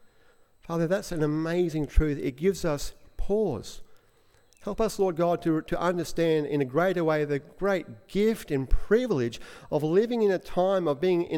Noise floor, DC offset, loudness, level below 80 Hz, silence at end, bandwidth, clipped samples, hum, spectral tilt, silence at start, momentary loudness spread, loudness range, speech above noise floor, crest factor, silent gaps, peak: -61 dBFS; under 0.1%; -27 LUFS; -36 dBFS; 0 s; 16.5 kHz; under 0.1%; none; -6.5 dB/octave; 0.65 s; 8 LU; 3 LU; 35 dB; 20 dB; none; -8 dBFS